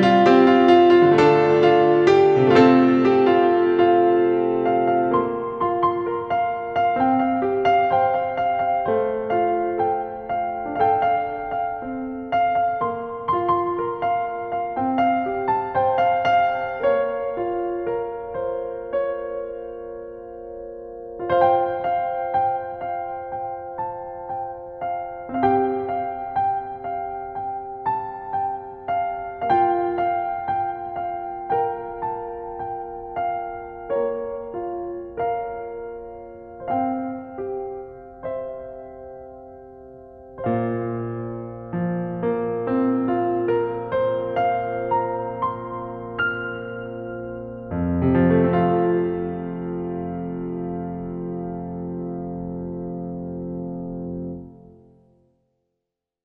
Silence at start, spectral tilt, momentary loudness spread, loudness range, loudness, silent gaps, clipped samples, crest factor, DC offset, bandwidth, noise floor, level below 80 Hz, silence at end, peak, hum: 0 s; -8 dB/octave; 16 LU; 12 LU; -22 LUFS; none; under 0.1%; 20 dB; under 0.1%; 7 kHz; -82 dBFS; -52 dBFS; 1.65 s; -2 dBFS; none